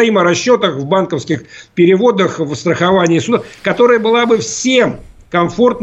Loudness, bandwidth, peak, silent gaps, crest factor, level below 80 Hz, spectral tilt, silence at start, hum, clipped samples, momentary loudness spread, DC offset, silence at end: -13 LUFS; 8.2 kHz; 0 dBFS; none; 12 dB; -48 dBFS; -5 dB/octave; 0 s; none; under 0.1%; 8 LU; under 0.1%; 0 s